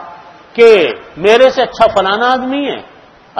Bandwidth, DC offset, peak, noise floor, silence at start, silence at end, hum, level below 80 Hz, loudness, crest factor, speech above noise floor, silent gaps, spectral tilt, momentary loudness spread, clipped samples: 9.6 kHz; under 0.1%; 0 dBFS; -34 dBFS; 0 s; 0 s; none; -46 dBFS; -10 LUFS; 12 dB; 24 dB; none; -4 dB/octave; 12 LU; 0.9%